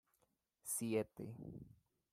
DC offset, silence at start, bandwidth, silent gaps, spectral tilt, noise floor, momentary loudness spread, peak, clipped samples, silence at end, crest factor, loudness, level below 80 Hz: under 0.1%; 0.65 s; 16 kHz; none; -5 dB/octave; -83 dBFS; 17 LU; -26 dBFS; under 0.1%; 0.45 s; 20 dB; -44 LUFS; -76 dBFS